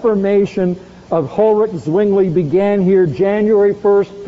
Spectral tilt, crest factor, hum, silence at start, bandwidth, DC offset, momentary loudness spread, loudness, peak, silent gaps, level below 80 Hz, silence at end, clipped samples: -8 dB/octave; 10 dB; none; 0 s; 7.6 kHz; under 0.1%; 7 LU; -14 LUFS; -4 dBFS; none; -48 dBFS; 0 s; under 0.1%